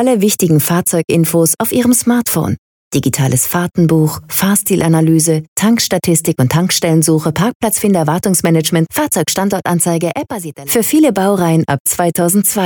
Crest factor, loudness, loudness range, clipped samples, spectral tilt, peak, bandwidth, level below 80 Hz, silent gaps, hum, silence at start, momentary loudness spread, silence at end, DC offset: 12 dB; -13 LUFS; 1 LU; under 0.1%; -5 dB/octave; -2 dBFS; over 20 kHz; -50 dBFS; 2.58-2.91 s, 5.48-5.56 s, 7.55-7.60 s, 11.80-11.85 s; none; 0 s; 5 LU; 0 s; under 0.1%